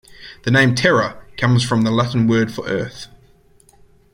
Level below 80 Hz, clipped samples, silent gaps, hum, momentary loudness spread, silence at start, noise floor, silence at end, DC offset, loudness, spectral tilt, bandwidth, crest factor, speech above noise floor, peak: -48 dBFS; under 0.1%; none; none; 16 LU; 0.2 s; -52 dBFS; 1.1 s; under 0.1%; -17 LUFS; -6 dB/octave; 15 kHz; 18 dB; 35 dB; -2 dBFS